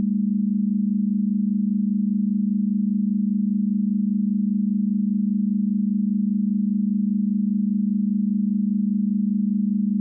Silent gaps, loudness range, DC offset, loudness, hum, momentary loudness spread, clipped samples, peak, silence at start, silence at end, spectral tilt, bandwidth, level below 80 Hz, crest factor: none; 0 LU; under 0.1%; -22 LUFS; none; 0 LU; under 0.1%; -14 dBFS; 0 s; 0 s; -26.5 dB/octave; 0.4 kHz; -80 dBFS; 6 dB